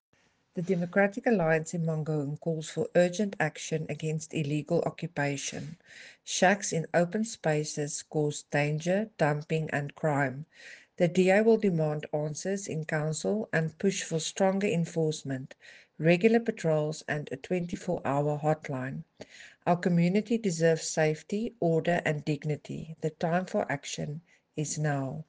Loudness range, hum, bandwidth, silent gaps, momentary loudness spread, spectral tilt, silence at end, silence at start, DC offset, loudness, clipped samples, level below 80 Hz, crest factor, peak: 3 LU; none; 10 kHz; none; 11 LU; -5.5 dB/octave; 0.05 s; 0.55 s; under 0.1%; -29 LUFS; under 0.1%; -68 dBFS; 20 dB; -10 dBFS